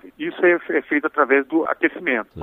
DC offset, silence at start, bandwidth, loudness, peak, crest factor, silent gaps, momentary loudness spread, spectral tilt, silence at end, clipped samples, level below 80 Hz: under 0.1%; 0.05 s; 3.9 kHz; -19 LUFS; -4 dBFS; 16 dB; none; 6 LU; -8 dB/octave; 0 s; under 0.1%; -60 dBFS